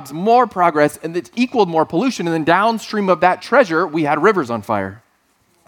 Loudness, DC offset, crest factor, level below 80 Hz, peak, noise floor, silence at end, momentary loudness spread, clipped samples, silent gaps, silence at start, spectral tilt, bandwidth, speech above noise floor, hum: -16 LUFS; under 0.1%; 16 dB; -62 dBFS; 0 dBFS; -60 dBFS; 0.7 s; 7 LU; under 0.1%; none; 0 s; -5.5 dB/octave; 18 kHz; 44 dB; none